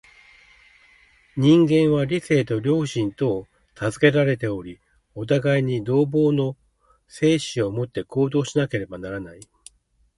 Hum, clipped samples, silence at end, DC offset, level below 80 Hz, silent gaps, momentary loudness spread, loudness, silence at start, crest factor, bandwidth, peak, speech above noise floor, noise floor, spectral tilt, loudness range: none; under 0.1%; 0.85 s; under 0.1%; -54 dBFS; none; 15 LU; -22 LUFS; 1.35 s; 20 dB; 11.5 kHz; -2 dBFS; 39 dB; -60 dBFS; -6.5 dB/octave; 4 LU